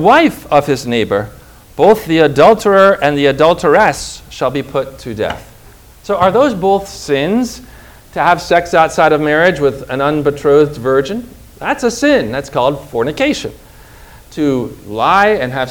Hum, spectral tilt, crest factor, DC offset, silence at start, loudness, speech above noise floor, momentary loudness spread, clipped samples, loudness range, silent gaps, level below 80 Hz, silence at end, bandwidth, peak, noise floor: none; -5 dB/octave; 12 dB; under 0.1%; 0 s; -13 LUFS; 27 dB; 13 LU; 0.5%; 6 LU; none; -40 dBFS; 0 s; over 20 kHz; 0 dBFS; -40 dBFS